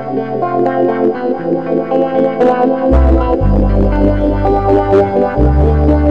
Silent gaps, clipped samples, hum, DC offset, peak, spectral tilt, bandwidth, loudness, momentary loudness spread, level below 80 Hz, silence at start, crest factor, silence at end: none; under 0.1%; none; 1%; -2 dBFS; -10 dB/octave; 5.4 kHz; -12 LUFS; 5 LU; -16 dBFS; 0 s; 8 dB; 0 s